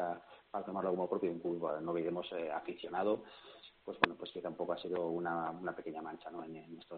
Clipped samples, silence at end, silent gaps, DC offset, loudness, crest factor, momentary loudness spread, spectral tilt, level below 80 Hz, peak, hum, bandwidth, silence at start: under 0.1%; 0 s; none; under 0.1%; -39 LUFS; 30 dB; 14 LU; -3.5 dB/octave; -76 dBFS; -8 dBFS; none; 4.6 kHz; 0 s